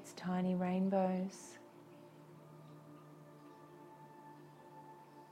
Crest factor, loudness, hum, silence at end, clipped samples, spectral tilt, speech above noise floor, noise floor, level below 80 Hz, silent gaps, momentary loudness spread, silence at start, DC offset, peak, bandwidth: 20 dB; -37 LUFS; none; 0.05 s; under 0.1%; -7.5 dB/octave; 22 dB; -58 dBFS; -82 dBFS; none; 23 LU; 0 s; under 0.1%; -22 dBFS; 12.5 kHz